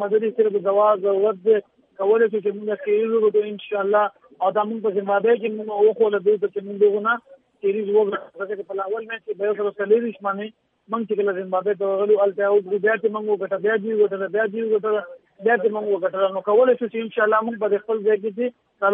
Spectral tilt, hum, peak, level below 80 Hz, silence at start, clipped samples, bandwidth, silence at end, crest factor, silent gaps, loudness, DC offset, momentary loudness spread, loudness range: -9.5 dB/octave; none; -6 dBFS; -82 dBFS; 0 s; under 0.1%; 3.7 kHz; 0 s; 16 dB; none; -21 LUFS; under 0.1%; 9 LU; 3 LU